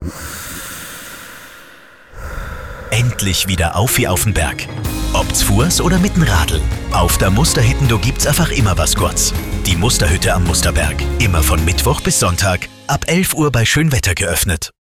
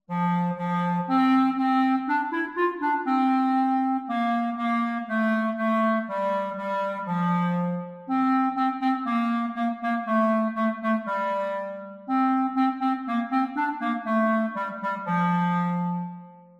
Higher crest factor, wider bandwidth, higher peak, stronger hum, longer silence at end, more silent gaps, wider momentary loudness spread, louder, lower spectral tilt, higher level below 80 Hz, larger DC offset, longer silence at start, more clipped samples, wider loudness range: about the same, 12 dB vs 14 dB; first, 18.5 kHz vs 7.2 kHz; first, -2 dBFS vs -12 dBFS; neither; about the same, 0.3 s vs 0.2 s; neither; first, 14 LU vs 6 LU; first, -14 LUFS vs -25 LUFS; second, -4 dB/octave vs -8.5 dB/octave; first, -22 dBFS vs -74 dBFS; neither; about the same, 0 s vs 0.1 s; neither; about the same, 4 LU vs 2 LU